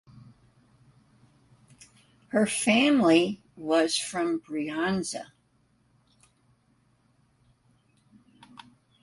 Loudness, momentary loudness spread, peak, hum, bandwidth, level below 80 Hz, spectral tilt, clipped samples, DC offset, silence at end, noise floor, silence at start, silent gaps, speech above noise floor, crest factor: -25 LUFS; 14 LU; -8 dBFS; none; 11.5 kHz; -70 dBFS; -4 dB/octave; under 0.1%; under 0.1%; 3.8 s; -67 dBFS; 2.35 s; none; 42 dB; 22 dB